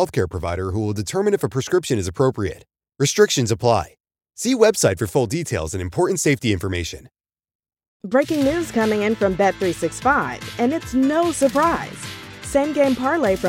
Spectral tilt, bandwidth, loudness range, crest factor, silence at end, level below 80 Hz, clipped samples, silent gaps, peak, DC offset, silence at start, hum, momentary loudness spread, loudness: -5 dB/octave; 17 kHz; 3 LU; 18 dB; 0 s; -44 dBFS; under 0.1%; 7.55-7.59 s, 7.88-8.00 s; -2 dBFS; under 0.1%; 0 s; none; 10 LU; -20 LUFS